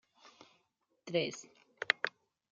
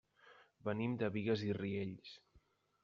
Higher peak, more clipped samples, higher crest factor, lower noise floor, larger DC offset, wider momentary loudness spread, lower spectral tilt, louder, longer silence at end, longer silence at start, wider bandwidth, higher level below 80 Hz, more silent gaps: first, -8 dBFS vs -24 dBFS; neither; first, 32 dB vs 18 dB; first, -79 dBFS vs -73 dBFS; neither; about the same, 16 LU vs 16 LU; second, -3.5 dB/octave vs -6 dB/octave; first, -36 LUFS vs -40 LUFS; about the same, 0.45 s vs 0.45 s; first, 1.05 s vs 0.25 s; about the same, 7.8 kHz vs 7.2 kHz; second, -88 dBFS vs -76 dBFS; neither